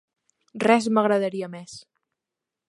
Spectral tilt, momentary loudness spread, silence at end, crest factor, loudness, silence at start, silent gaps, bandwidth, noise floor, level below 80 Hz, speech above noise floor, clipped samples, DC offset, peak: -5.5 dB/octave; 22 LU; 0.9 s; 20 dB; -22 LUFS; 0.55 s; none; 11.5 kHz; -86 dBFS; -74 dBFS; 64 dB; under 0.1%; under 0.1%; -6 dBFS